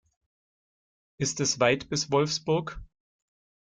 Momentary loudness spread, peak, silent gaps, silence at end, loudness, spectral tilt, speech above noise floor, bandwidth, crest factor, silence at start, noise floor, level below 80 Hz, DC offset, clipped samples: 9 LU; -8 dBFS; none; 0.85 s; -27 LUFS; -3.5 dB/octave; over 63 dB; 10 kHz; 22 dB; 1.2 s; under -90 dBFS; -54 dBFS; under 0.1%; under 0.1%